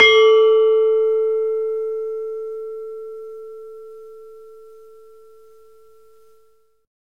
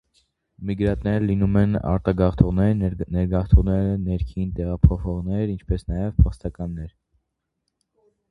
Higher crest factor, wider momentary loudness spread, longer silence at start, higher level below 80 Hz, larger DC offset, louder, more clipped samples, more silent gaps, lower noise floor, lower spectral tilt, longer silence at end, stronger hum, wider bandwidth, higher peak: about the same, 20 dB vs 22 dB; first, 26 LU vs 12 LU; second, 0 s vs 0.6 s; second, -68 dBFS vs -28 dBFS; first, 0.3% vs under 0.1%; first, -17 LUFS vs -22 LUFS; neither; neither; second, -59 dBFS vs -77 dBFS; second, -1 dB/octave vs -10.5 dB/octave; first, 2.65 s vs 1.4 s; neither; first, 6.2 kHz vs 5 kHz; about the same, 0 dBFS vs 0 dBFS